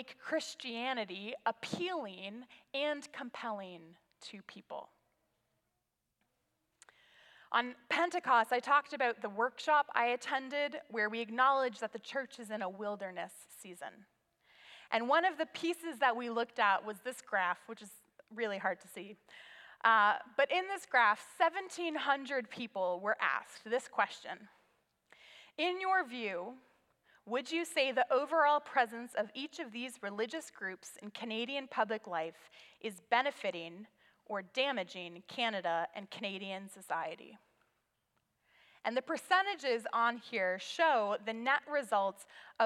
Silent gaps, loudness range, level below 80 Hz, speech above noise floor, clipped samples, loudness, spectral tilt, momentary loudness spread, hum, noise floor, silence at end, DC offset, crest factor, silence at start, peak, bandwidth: none; 10 LU; under -90 dBFS; 50 dB; under 0.1%; -35 LUFS; -3 dB/octave; 18 LU; none; -85 dBFS; 0 s; under 0.1%; 22 dB; 0 s; -14 dBFS; 15.5 kHz